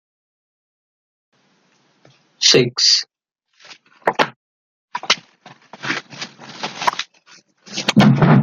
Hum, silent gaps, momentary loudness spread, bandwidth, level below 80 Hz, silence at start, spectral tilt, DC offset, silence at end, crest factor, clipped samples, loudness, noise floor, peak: none; 4.36-4.88 s; 20 LU; 12 kHz; -54 dBFS; 2.4 s; -4 dB/octave; under 0.1%; 0 s; 20 dB; under 0.1%; -16 LUFS; -62 dBFS; 0 dBFS